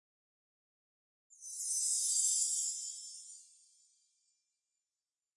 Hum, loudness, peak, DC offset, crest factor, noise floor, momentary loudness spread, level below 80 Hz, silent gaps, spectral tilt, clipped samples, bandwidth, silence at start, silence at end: none; -32 LUFS; -20 dBFS; under 0.1%; 22 dB; under -90 dBFS; 22 LU; under -90 dBFS; none; 10.5 dB/octave; under 0.1%; 11.5 kHz; 1.4 s; 1.95 s